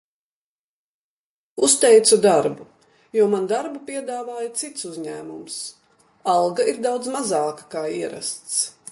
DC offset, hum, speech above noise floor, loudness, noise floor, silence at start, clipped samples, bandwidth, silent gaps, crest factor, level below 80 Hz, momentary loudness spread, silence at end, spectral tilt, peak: under 0.1%; none; over 69 dB; -21 LUFS; under -90 dBFS; 1.55 s; under 0.1%; 11.5 kHz; none; 20 dB; -70 dBFS; 18 LU; 0.2 s; -2.5 dB/octave; -2 dBFS